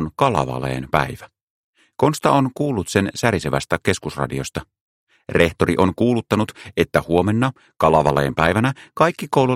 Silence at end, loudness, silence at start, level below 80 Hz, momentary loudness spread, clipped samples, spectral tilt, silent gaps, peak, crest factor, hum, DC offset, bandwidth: 0 s; -19 LUFS; 0 s; -42 dBFS; 8 LU; under 0.1%; -6 dB/octave; 1.43-1.73 s, 4.81-5.07 s; 0 dBFS; 18 dB; none; under 0.1%; 16 kHz